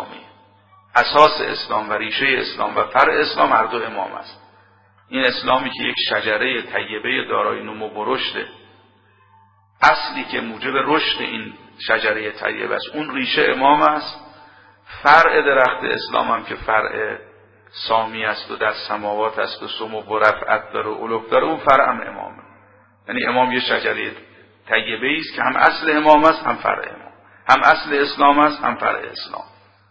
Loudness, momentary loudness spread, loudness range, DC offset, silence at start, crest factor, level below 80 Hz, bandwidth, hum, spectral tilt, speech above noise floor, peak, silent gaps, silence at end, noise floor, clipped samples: -18 LUFS; 14 LU; 6 LU; under 0.1%; 0 s; 20 dB; -54 dBFS; 8 kHz; none; -4.5 dB/octave; 36 dB; 0 dBFS; none; 0.45 s; -54 dBFS; under 0.1%